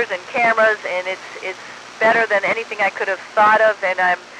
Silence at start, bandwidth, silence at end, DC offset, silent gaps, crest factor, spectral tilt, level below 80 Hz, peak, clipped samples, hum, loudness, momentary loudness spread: 0 s; 10.5 kHz; 0 s; under 0.1%; none; 14 dB; -3 dB/octave; -70 dBFS; -4 dBFS; under 0.1%; none; -17 LUFS; 14 LU